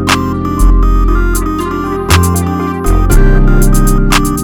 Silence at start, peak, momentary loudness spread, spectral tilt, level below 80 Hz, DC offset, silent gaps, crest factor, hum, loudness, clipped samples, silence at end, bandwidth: 0 s; 0 dBFS; 5 LU; -5 dB/octave; -10 dBFS; under 0.1%; none; 8 dB; none; -11 LUFS; under 0.1%; 0 s; 18.5 kHz